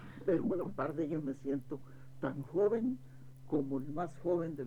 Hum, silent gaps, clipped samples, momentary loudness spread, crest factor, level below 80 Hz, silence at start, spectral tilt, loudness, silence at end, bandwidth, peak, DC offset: none; none; under 0.1%; 14 LU; 16 dB; -64 dBFS; 0 s; -9.5 dB/octave; -37 LUFS; 0 s; 12.5 kHz; -20 dBFS; under 0.1%